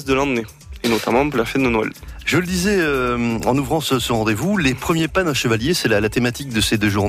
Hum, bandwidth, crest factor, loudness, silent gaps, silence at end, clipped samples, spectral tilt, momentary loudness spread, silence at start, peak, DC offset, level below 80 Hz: none; 16 kHz; 14 dB; -19 LUFS; none; 0 s; under 0.1%; -4.5 dB/octave; 4 LU; 0 s; -4 dBFS; under 0.1%; -38 dBFS